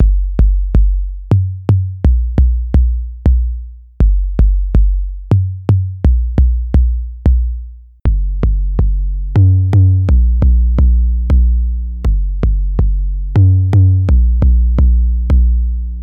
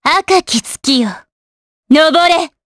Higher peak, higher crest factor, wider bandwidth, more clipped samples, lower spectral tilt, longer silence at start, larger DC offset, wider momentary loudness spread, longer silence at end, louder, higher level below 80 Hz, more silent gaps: about the same, -2 dBFS vs 0 dBFS; about the same, 10 dB vs 14 dB; second, 2.6 kHz vs 11 kHz; neither; first, -10.5 dB/octave vs -2.5 dB/octave; about the same, 0 s vs 0.05 s; neither; about the same, 7 LU vs 7 LU; second, 0 s vs 0.2 s; about the same, -14 LUFS vs -12 LUFS; first, -12 dBFS vs -52 dBFS; second, none vs 1.32-1.83 s